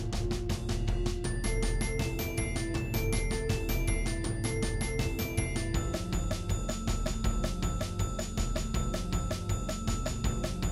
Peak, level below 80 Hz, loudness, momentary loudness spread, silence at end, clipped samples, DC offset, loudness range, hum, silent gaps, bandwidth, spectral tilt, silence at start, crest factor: -16 dBFS; -34 dBFS; -33 LUFS; 2 LU; 0 s; under 0.1%; under 0.1%; 1 LU; none; none; 15 kHz; -5 dB/octave; 0 s; 14 dB